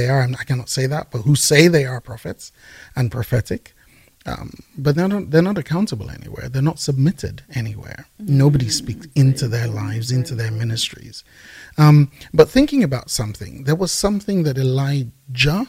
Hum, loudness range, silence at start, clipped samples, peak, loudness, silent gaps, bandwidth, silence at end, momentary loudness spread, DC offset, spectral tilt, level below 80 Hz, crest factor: none; 5 LU; 0 s; under 0.1%; 0 dBFS; -18 LUFS; none; 16 kHz; 0.05 s; 18 LU; under 0.1%; -5.5 dB/octave; -42 dBFS; 18 dB